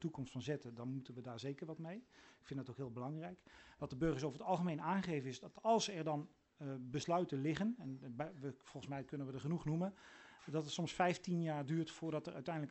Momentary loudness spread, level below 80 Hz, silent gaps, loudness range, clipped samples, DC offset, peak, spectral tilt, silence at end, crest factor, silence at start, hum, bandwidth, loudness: 14 LU; -70 dBFS; none; 7 LU; under 0.1%; under 0.1%; -22 dBFS; -6 dB/octave; 0 s; 20 dB; 0 s; none; 8.2 kHz; -43 LUFS